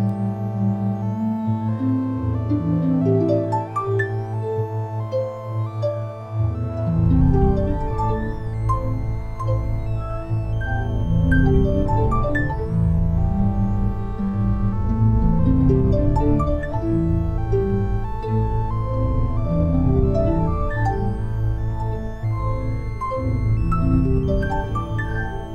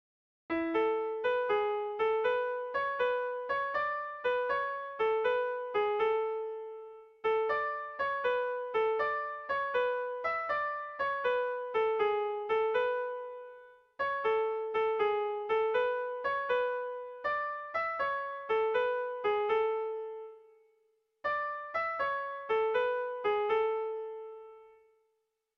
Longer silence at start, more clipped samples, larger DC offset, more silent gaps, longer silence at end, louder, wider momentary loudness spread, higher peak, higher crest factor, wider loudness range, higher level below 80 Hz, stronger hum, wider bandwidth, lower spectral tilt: second, 0 s vs 0.5 s; neither; neither; neither; second, 0 s vs 0.9 s; first, -22 LUFS vs -32 LUFS; about the same, 8 LU vs 8 LU; first, -4 dBFS vs -20 dBFS; about the same, 16 dB vs 14 dB; about the same, 4 LU vs 2 LU; first, -26 dBFS vs -70 dBFS; neither; about the same, 5.6 kHz vs 6 kHz; first, -10 dB/octave vs -5 dB/octave